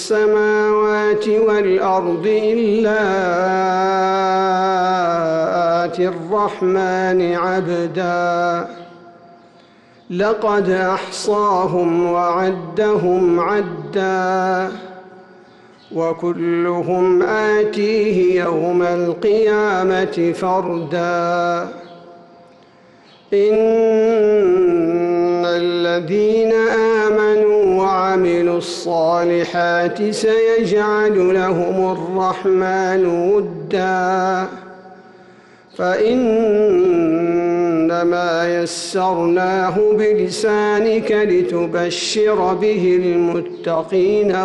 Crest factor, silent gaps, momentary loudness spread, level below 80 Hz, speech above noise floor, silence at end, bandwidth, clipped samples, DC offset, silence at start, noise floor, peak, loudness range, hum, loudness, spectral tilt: 8 dB; none; 6 LU; -54 dBFS; 32 dB; 0 s; 11.5 kHz; under 0.1%; under 0.1%; 0 s; -47 dBFS; -8 dBFS; 4 LU; none; -16 LUFS; -5.5 dB/octave